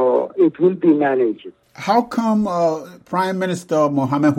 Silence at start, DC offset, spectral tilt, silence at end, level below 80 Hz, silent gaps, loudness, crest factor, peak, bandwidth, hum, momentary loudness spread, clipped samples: 0 s; under 0.1%; -7 dB/octave; 0 s; -60 dBFS; none; -18 LUFS; 14 dB; -4 dBFS; 14 kHz; none; 8 LU; under 0.1%